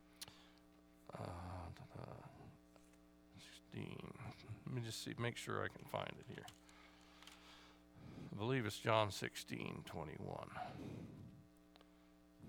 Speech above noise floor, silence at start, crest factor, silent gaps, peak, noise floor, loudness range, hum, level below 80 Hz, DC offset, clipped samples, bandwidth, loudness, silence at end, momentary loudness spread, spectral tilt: 23 dB; 0 s; 28 dB; none; -20 dBFS; -68 dBFS; 12 LU; 60 Hz at -70 dBFS; -74 dBFS; under 0.1%; under 0.1%; over 20 kHz; -47 LUFS; 0 s; 25 LU; -5 dB/octave